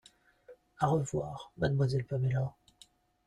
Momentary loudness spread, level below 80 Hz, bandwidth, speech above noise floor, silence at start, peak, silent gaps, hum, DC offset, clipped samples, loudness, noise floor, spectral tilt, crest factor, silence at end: 8 LU; -60 dBFS; 11 kHz; 32 dB; 0.5 s; -14 dBFS; none; none; under 0.1%; under 0.1%; -33 LUFS; -63 dBFS; -7 dB/octave; 20 dB; 0.75 s